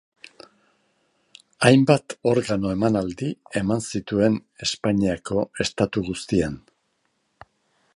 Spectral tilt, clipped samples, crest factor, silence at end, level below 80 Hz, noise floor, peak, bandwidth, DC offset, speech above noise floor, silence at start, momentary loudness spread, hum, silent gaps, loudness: -5.5 dB/octave; under 0.1%; 22 dB; 1.35 s; -50 dBFS; -71 dBFS; -2 dBFS; 11.5 kHz; under 0.1%; 49 dB; 1.6 s; 10 LU; none; none; -23 LUFS